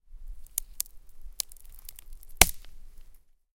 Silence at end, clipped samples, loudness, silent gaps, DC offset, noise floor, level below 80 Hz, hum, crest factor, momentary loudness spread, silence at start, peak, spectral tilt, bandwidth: 0.4 s; under 0.1%; -27 LUFS; none; under 0.1%; -52 dBFS; -40 dBFS; none; 32 dB; 25 LU; 0.05 s; 0 dBFS; -1 dB/octave; 17 kHz